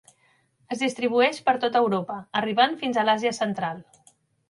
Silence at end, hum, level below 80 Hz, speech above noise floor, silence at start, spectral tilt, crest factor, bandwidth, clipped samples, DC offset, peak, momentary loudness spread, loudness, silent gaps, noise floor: 0.7 s; none; -72 dBFS; 41 dB; 0.7 s; -4.5 dB/octave; 20 dB; 11.5 kHz; under 0.1%; under 0.1%; -6 dBFS; 9 LU; -24 LUFS; none; -65 dBFS